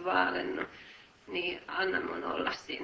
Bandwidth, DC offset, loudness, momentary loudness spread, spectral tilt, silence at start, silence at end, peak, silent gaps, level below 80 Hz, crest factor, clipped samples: 8 kHz; under 0.1%; -33 LUFS; 17 LU; -4 dB/octave; 0 s; 0 s; -14 dBFS; none; -66 dBFS; 22 dB; under 0.1%